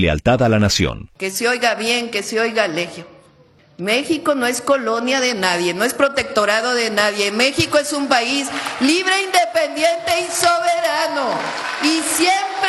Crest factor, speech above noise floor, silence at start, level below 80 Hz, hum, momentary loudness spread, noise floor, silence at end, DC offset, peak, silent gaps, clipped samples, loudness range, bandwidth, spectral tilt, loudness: 18 dB; 33 dB; 0 s; -42 dBFS; none; 5 LU; -50 dBFS; 0 s; under 0.1%; 0 dBFS; none; under 0.1%; 3 LU; 14.5 kHz; -3.5 dB/octave; -17 LUFS